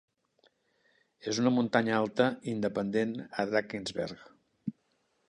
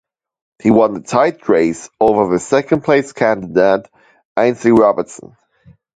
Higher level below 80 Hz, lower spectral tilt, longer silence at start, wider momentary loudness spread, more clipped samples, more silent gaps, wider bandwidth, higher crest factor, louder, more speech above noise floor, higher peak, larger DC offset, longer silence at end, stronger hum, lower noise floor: second, -70 dBFS vs -50 dBFS; about the same, -5.5 dB/octave vs -6 dB/octave; first, 1.25 s vs 0.65 s; first, 15 LU vs 7 LU; neither; second, none vs 4.25-4.35 s; first, 10.5 kHz vs 9.4 kHz; first, 22 dB vs 14 dB; second, -31 LUFS vs -14 LUFS; first, 44 dB vs 35 dB; second, -10 dBFS vs 0 dBFS; neither; second, 0.6 s vs 0.8 s; neither; first, -75 dBFS vs -49 dBFS